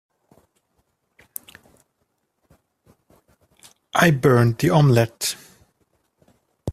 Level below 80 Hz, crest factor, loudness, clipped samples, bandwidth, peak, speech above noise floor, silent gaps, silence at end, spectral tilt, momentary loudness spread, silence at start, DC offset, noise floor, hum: -56 dBFS; 22 dB; -18 LUFS; under 0.1%; 15.5 kHz; -2 dBFS; 55 dB; none; 0 s; -6 dB/octave; 21 LU; 3.95 s; under 0.1%; -72 dBFS; none